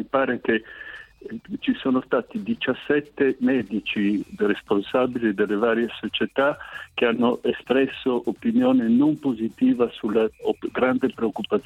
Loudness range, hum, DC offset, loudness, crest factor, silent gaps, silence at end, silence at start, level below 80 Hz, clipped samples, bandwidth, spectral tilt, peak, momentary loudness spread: 3 LU; none; under 0.1%; -23 LUFS; 18 dB; none; 0.05 s; 0 s; -60 dBFS; under 0.1%; 7.8 kHz; -7 dB/octave; -4 dBFS; 7 LU